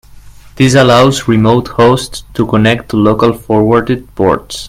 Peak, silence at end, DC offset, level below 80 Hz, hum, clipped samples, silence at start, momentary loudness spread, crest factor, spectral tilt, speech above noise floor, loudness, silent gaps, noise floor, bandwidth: 0 dBFS; 0 s; under 0.1%; -36 dBFS; none; 0.3%; 0.15 s; 7 LU; 10 dB; -6 dB/octave; 25 dB; -10 LUFS; none; -34 dBFS; 16 kHz